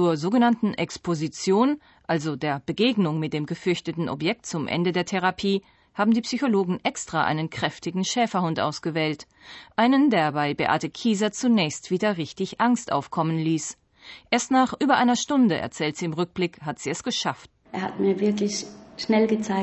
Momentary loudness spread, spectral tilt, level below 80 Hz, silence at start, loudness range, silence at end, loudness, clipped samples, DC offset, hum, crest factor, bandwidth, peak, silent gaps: 9 LU; -5 dB/octave; -62 dBFS; 0 s; 3 LU; 0 s; -24 LUFS; under 0.1%; under 0.1%; none; 18 dB; 8.4 kHz; -6 dBFS; none